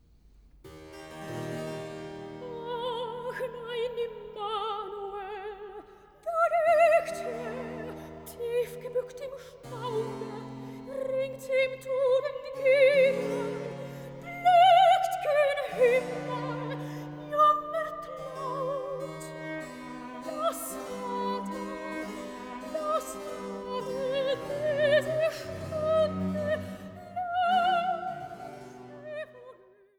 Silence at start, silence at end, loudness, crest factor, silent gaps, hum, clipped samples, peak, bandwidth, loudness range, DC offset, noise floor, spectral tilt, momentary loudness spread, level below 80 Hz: 0.65 s; 0.45 s; -29 LUFS; 20 dB; none; none; under 0.1%; -10 dBFS; 18.5 kHz; 11 LU; under 0.1%; -57 dBFS; -4.5 dB/octave; 18 LU; -64 dBFS